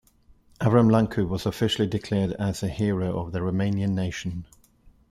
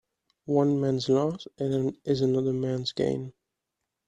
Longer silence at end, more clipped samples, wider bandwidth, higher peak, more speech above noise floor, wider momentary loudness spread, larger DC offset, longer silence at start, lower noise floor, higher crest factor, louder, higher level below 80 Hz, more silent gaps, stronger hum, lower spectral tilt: about the same, 0.65 s vs 0.75 s; neither; first, 14.5 kHz vs 9.8 kHz; about the same, -8 dBFS vs -10 dBFS; second, 33 dB vs 58 dB; about the same, 9 LU vs 8 LU; neither; first, 0.6 s vs 0.45 s; second, -57 dBFS vs -84 dBFS; about the same, 18 dB vs 18 dB; about the same, -25 LUFS vs -27 LUFS; first, -50 dBFS vs -64 dBFS; neither; neither; about the same, -7 dB/octave vs -7.5 dB/octave